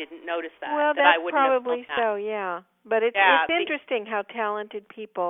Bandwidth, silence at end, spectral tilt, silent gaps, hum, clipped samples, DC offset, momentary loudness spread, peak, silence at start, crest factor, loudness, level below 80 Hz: 3.9 kHz; 0 s; -6.5 dB/octave; none; none; under 0.1%; under 0.1%; 14 LU; -4 dBFS; 0 s; 20 dB; -23 LUFS; -72 dBFS